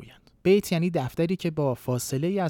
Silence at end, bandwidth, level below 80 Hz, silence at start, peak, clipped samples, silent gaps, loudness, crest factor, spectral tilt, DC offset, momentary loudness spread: 0 s; 18.5 kHz; -58 dBFS; 0 s; -10 dBFS; under 0.1%; none; -26 LUFS; 16 dB; -6 dB/octave; under 0.1%; 6 LU